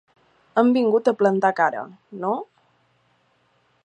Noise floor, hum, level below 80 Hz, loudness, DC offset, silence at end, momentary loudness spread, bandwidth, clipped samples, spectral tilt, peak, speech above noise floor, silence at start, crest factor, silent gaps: -64 dBFS; none; -80 dBFS; -21 LUFS; under 0.1%; 1.4 s; 12 LU; 8.6 kHz; under 0.1%; -7 dB/octave; -4 dBFS; 44 dB; 0.55 s; 20 dB; none